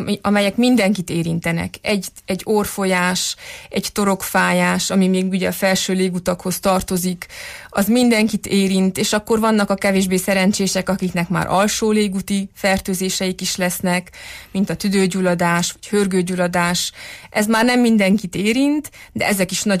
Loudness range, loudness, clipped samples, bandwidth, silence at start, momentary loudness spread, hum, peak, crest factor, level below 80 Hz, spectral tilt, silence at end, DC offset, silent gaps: 2 LU; -18 LUFS; under 0.1%; 15.5 kHz; 0 s; 8 LU; none; -4 dBFS; 14 dB; -46 dBFS; -4.5 dB/octave; 0 s; under 0.1%; none